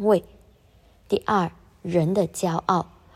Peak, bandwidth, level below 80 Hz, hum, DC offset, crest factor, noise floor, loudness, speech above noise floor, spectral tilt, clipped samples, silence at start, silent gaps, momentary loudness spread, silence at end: -6 dBFS; 15.5 kHz; -54 dBFS; none; under 0.1%; 20 dB; -56 dBFS; -24 LUFS; 33 dB; -6.5 dB/octave; under 0.1%; 0 s; none; 6 LU; 0.3 s